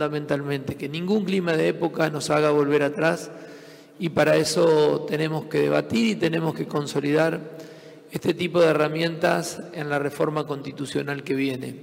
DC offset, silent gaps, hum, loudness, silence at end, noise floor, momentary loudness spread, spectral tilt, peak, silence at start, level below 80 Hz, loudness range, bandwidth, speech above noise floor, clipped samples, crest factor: under 0.1%; none; none; -23 LUFS; 0 s; -45 dBFS; 12 LU; -5.5 dB/octave; -6 dBFS; 0 s; -66 dBFS; 2 LU; 16 kHz; 22 dB; under 0.1%; 18 dB